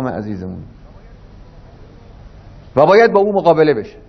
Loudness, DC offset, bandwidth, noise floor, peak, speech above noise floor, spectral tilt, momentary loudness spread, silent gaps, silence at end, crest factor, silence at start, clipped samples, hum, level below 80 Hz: -13 LUFS; under 0.1%; 6.4 kHz; -39 dBFS; 0 dBFS; 26 dB; -7.5 dB/octave; 18 LU; none; 0.2 s; 16 dB; 0 s; under 0.1%; none; -42 dBFS